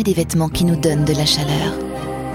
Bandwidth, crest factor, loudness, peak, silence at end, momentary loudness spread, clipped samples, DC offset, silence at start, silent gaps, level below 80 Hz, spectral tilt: 17 kHz; 14 dB; -18 LUFS; -4 dBFS; 0 s; 10 LU; under 0.1%; under 0.1%; 0 s; none; -36 dBFS; -5 dB/octave